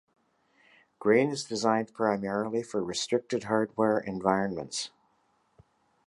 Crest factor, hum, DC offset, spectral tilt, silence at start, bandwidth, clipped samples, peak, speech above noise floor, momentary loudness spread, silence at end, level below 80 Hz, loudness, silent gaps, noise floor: 20 dB; none; under 0.1%; -4.5 dB/octave; 1 s; 11.5 kHz; under 0.1%; -10 dBFS; 42 dB; 7 LU; 1.2 s; -68 dBFS; -29 LUFS; none; -71 dBFS